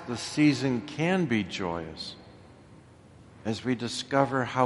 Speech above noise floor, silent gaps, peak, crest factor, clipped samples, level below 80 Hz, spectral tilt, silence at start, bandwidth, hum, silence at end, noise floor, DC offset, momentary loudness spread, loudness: 25 dB; none; -6 dBFS; 22 dB; under 0.1%; -60 dBFS; -5.5 dB/octave; 0 s; 11.5 kHz; none; 0 s; -53 dBFS; under 0.1%; 14 LU; -28 LUFS